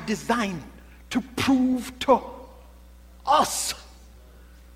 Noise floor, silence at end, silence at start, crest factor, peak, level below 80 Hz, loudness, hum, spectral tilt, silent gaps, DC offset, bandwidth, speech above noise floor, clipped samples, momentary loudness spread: -48 dBFS; 0.35 s; 0 s; 20 dB; -6 dBFS; -48 dBFS; -24 LUFS; none; -3.5 dB/octave; none; under 0.1%; 16 kHz; 25 dB; under 0.1%; 17 LU